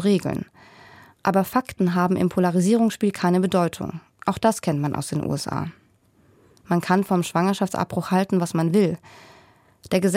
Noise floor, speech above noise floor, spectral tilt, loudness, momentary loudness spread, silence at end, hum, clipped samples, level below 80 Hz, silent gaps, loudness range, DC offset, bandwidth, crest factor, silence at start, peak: -59 dBFS; 37 dB; -6.5 dB/octave; -22 LUFS; 9 LU; 0 s; none; under 0.1%; -58 dBFS; none; 4 LU; under 0.1%; 16.5 kHz; 18 dB; 0 s; -6 dBFS